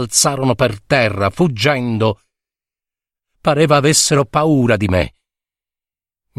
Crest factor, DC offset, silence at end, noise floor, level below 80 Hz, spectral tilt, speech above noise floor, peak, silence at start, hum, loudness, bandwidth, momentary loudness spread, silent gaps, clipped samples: 16 dB; under 0.1%; 1.3 s; under -90 dBFS; -42 dBFS; -4 dB/octave; over 76 dB; 0 dBFS; 0 s; none; -15 LUFS; 15 kHz; 7 LU; none; under 0.1%